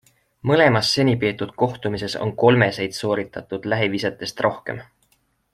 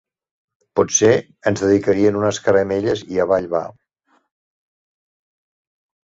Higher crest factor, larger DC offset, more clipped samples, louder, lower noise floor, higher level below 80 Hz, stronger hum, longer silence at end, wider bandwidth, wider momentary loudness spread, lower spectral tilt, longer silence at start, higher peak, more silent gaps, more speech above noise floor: about the same, 20 dB vs 18 dB; neither; neither; second, -21 LUFS vs -18 LUFS; about the same, -65 dBFS vs -63 dBFS; about the same, -56 dBFS vs -52 dBFS; neither; second, 0.7 s vs 2.3 s; first, 14.5 kHz vs 7.8 kHz; first, 13 LU vs 9 LU; about the same, -5.5 dB/octave vs -4.5 dB/octave; second, 0.45 s vs 0.75 s; about the same, -2 dBFS vs -2 dBFS; neither; about the same, 45 dB vs 46 dB